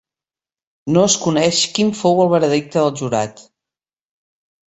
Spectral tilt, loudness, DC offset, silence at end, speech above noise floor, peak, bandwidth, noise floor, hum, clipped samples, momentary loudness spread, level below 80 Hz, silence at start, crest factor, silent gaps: -4 dB/octave; -16 LUFS; under 0.1%; 1.25 s; over 74 dB; -2 dBFS; 8.2 kHz; under -90 dBFS; none; under 0.1%; 7 LU; -58 dBFS; 0.85 s; 16 dB; none